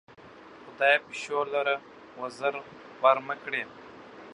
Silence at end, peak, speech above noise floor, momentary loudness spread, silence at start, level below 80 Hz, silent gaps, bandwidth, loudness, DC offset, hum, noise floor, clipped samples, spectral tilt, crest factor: 0 s; -6 dBFS; 22 dB; 24 LU; 0.2 s; -76 dBFS; none; 11 kHz; -28 LUFS; under 0.1%; none; -50 dBFS; under 0.1%; -3 dB/octave; 24 dB